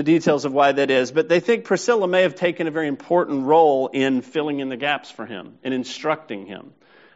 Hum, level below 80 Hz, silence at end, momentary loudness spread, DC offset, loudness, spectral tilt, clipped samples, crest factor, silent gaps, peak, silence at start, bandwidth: none; -70 dBFS; 0.45 s; 16 LU; under 0.1%; -20 LUFS; -3.5 dB/octave; under 0.1%; 16 dB; none; -4 dBFS; 0 s; 8 kHz